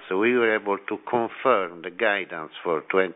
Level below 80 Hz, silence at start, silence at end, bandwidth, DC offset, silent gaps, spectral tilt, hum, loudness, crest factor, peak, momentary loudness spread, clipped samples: -72 dBFS; 0 s; 0 s; 4 kHz; under 0.1%; none; -7.5 dB/octave; none; -24 LUFS; 18 dB; -6 dBFS; 9 LU; under 0.1%